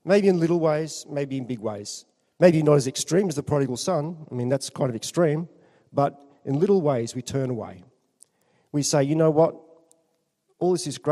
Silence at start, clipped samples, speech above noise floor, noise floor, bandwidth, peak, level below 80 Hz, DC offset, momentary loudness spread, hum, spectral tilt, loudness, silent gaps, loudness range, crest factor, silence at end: 0.05 s; under 0.1%; 49 dB; -72 dBFS; 13.5 kHz; -4 dBFS; -66 dBFS; under 0.1%; 11 LU; none; -6 dB/octave; -24 LUFS; none; 4 LU; 20 dB; 0 s